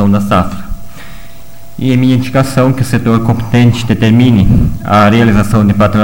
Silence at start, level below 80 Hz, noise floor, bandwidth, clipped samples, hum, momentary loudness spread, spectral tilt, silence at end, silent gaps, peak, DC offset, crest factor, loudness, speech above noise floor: 0 s; -24 dBFS; -36 dBFS; 17 kHz; 0.1%; none; 10 LU; -7 dB/octave; 0 s; none; 0 dBFS; 6%; 10 dB; -10 LUFS; 27 dB